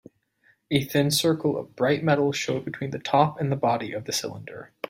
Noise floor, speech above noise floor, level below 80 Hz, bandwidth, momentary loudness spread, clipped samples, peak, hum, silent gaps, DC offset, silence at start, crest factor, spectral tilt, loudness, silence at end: -64 dBFS; 40 dB; -62 dBFS; 16 kHz; 10 LU; under 0.1%; -6 dBFS; none; none; under 0.1%; 0.7 s; 20 dB; -5 dB/octave; -25 LUFS; 0 s